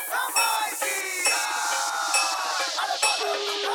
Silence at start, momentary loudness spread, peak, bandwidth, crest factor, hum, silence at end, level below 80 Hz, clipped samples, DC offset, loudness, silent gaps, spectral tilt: 0 s; 3 LU; -8 dBFS; over 20 kHz; 18 dB; none; 0 s; -74 dBFS; under 0.1%; under 0.1%; -24 LUFS; none; 3.5 dB/octave